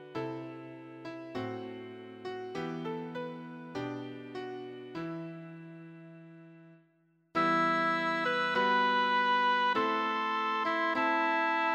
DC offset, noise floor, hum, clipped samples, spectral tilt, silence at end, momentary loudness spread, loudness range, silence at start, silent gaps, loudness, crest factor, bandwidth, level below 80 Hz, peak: under 0.1%; -70 dBFS; none; under 0.1%; -5 dB/octave; 0 s; 19 LU; 14 LU; 0 s; none; -31 LUFS; 16 dB; 8.4 kHz; -78 dBFS; -18 dBFS